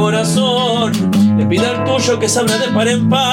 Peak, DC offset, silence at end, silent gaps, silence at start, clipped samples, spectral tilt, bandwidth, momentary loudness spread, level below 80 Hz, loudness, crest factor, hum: -4 dBFS; under 0.1%; 0 s; none; 0 s; under 0.1%; -4.5 dB/octave; 17 kHz; 2 LU; -50 dBFS; -14 LUFS; 10 dB; none